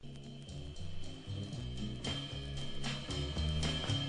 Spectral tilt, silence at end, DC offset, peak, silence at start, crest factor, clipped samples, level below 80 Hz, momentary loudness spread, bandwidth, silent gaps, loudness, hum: -4.5 dB/octave; 0 s; under 0.1%; -24 dBFS; 0 s; 16 dB; under 0.1%; -48 dBFS; 12 LU; 11 kHz; none; -40 LUFS; none